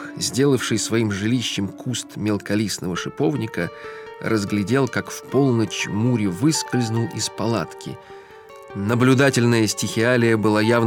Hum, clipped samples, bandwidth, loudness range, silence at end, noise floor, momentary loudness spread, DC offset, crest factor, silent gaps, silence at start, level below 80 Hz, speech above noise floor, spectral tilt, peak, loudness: none; under 0.1%; 17 kHz; 4 LU; 0 s; -42 dBFS; 11 LU; under 0.1%; 18 dB; none; 0 s; -62 dBFS; 22 dB; -5 dB/octave; -4 dBFS; -21 LUFS